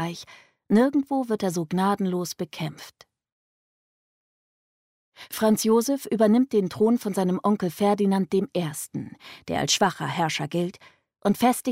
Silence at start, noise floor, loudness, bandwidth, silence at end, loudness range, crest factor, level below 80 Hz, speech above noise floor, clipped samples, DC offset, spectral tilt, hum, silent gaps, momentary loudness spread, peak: 0 s; under -90 dBFS; -24 LUFS; 16 kHz; 0 s; 8 LU; 16 dB; -66 dBFS; over 66 dB; under 0.1%; under 0.1%; -5 dB/octave; none; 3.32-5.12 s; 12 LU; -8 dBFS